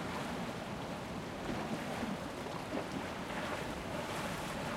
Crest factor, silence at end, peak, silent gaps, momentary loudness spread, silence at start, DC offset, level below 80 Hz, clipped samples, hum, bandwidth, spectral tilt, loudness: 14 dB; 0 s; -26 dBFS; none; 3 LU; 0 s; under 0.1%; -58 dBFS; under 0.1%; none; 16 kHz; -5 dB/octave; -40 LUFS